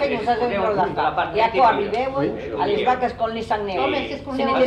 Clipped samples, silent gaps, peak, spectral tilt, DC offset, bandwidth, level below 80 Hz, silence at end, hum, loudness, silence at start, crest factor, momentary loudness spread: under 0.1%; none; -6 dBFS; -6.5 dB/octave; under 0.1%; 9.8 kHz; -46 dBFS; 0 s; none; -21 LUFS; 0 s; 14 dB; 7 LU